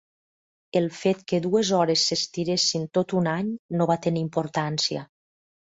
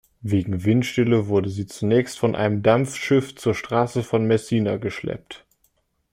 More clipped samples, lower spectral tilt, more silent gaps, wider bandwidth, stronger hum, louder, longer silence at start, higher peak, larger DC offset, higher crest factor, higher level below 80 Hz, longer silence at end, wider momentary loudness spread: neither; second, -4.5 dB/octave vs -6.5 dB/octave; first, 3.59-3.69 s vs none; second, 8 kHz vs 15.5 kHz; neither; about the same, -24 LUFS vs -22 LUFS; first, 0.75 s vs 0.25 s; second, -8 dBFS vs -4 dBFS; neither; about the same, 16 dB vs 18 dB; second, -64 dBFS vs -56 dBFS; second, 0.55 s vs 0.75 s; second, 6 LU vs 10 LU